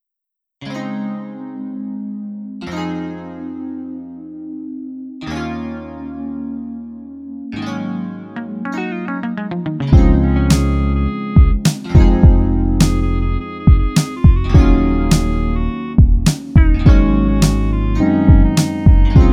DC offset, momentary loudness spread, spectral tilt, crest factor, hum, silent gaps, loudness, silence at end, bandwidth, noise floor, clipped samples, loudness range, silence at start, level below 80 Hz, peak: under 0.1%; 18 LU; -7 dB/octave; 14 dB; none; none; -15 LUFS; 0 s; 14.5 kHz; -81 dBFS; under 0.1%; 14 LU; 0.6 s; -18 dBFS; 0 dBFS